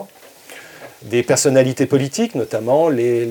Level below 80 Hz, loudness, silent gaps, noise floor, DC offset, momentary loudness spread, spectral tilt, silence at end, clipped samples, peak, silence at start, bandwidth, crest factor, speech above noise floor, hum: -64 dBFS; -17 LUFS; none; -42 dBFS; under 0.1%; 23 LU; -5 dB/octave; 0 s; under 0.1%; -2 dBFS; 0 s; 19 kHz; 16 dB; 26 dB; none